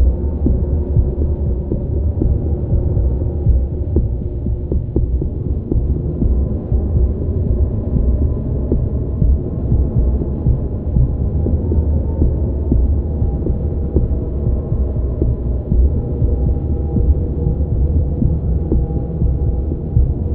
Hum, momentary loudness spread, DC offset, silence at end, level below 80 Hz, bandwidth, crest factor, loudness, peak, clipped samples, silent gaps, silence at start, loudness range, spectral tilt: none; 3 LU; under 0.1%; 0 s; -18 dBFS; 1.5 kHz; 16 dB; -18 LUFS; 0 dBFS; under 0.1%; none; 0 s; 1 LU; -14.5 dB/octave